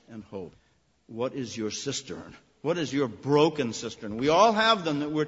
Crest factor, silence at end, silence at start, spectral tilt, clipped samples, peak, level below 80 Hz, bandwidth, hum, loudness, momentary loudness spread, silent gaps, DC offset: 20 dB; 0 s; 0.1 s; -4.5 dB/octave; under 0.1%; -6 dBFS; -62 dBFS; 8 kHz; none; -26 LUFS; 20 LU; none; under 0.1%